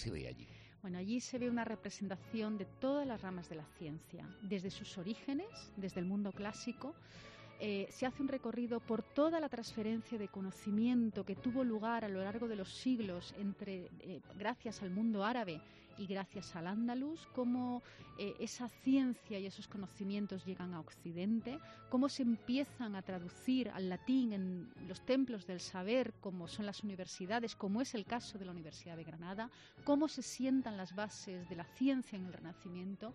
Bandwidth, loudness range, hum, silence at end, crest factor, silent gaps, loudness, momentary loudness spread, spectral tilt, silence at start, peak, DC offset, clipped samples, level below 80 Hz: 11.5 kHz; 5 LU; none; 0 s; 18 dB; none; -41 LUFS; 13 LU; -5.5 dB/octave; 0 s; -22 dBFS; under 0.1%; under 0.1%; -70 dBFS